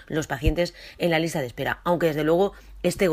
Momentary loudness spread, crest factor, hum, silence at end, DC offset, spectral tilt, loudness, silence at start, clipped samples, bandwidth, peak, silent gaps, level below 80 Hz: 6 LU; 16 dB; none; 0 s; under 0.1%; -5.5 dB/octave; -25 LUFS; 0 s; under 0.1%; 15.5 kHz; -8 dBFS; none; -36 dBFS